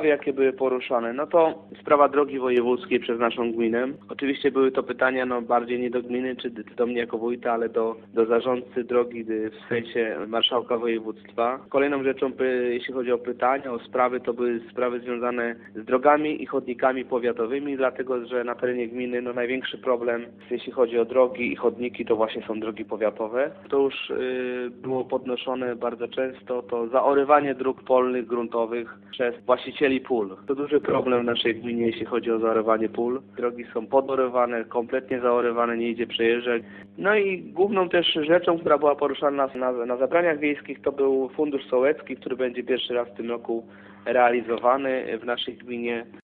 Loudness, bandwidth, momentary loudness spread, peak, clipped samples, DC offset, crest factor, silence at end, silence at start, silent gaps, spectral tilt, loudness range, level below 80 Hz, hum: -25 LUFS; 4.4 kHz; 8 LU; -4 dBFS; under 0.1%; under 0.1%; 20 dB; 0.05 s; 0 s; none; -8.5 dB/octave; 4 LU; -66 dBFS; none